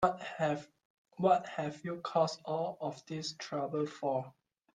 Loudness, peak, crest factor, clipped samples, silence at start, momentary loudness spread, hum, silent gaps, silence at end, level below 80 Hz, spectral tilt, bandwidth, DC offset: -35 LUFS; -14 dBFS; 22 dB; under 0.1%; 0 s; 10 LU; none; 0.85-1.05 s; 0.45 s; -74 dBFS; -5.5 dB/octave; 9.8 kHz; under 0.1%